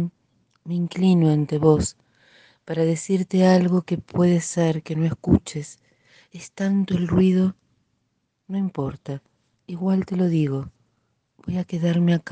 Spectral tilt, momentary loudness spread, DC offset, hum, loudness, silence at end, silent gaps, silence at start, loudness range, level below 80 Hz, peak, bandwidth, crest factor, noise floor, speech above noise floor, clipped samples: -7 dB/octave; 16 LU; under 0.1%; none; -22 LUFS; 0 s; none; 0 s; 6 LU; -48 dBFS; -2 dBFS; 9.4 kHz; 20 dB; -73 dBFS; 52 dB; under 0.1%